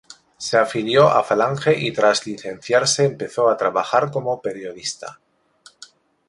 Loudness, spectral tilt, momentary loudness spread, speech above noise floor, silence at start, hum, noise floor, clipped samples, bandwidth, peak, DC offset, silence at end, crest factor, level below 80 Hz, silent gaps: -19 LUFS; -4 dB/octave; 14 LU; 33 dB; 0.4 s; none; -52 dBFS; under 0.1%; 11.5 kHz; -2 dBFS; under 0.1%; 1.15 s; 18 dB; -62 dBFS; none